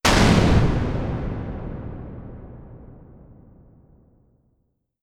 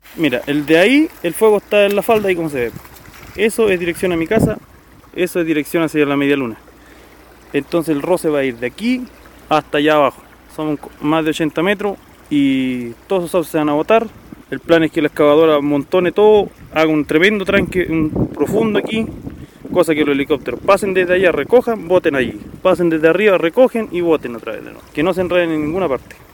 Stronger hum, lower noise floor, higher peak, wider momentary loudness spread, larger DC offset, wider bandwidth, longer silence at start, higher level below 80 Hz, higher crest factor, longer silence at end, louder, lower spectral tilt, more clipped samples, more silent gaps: neither; first, -70 dBFS vs -42 dBFS; second, -4 dBFS vs 0 dBFS; first, 26 LU vs 11 LU; neither; about the same, 16.5 kHz vs 17.5 kHz; about the same, 0.05 s vs 0.15 s; first, -32 dBFS vs -44 dBFS; about the same, 20 dB vs 16 dB; first, 2.1 s vs 0.3 s; second, -21 LUFS vs -16 LUFS; about the same, -5.5 dB/octave vs -5.5 dB/octave; neither; neither